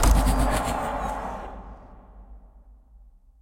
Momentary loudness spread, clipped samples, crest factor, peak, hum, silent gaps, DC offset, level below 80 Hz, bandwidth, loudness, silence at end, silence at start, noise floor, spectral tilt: 24 LU; under 0.1%; 20 dB; -6 dBFS; none; none; under 0.1%; -28 dBFS; 16.5 kHz; -26 LUFS; 0.95 s; 0 s; -52 dBFS; -5 dB/octave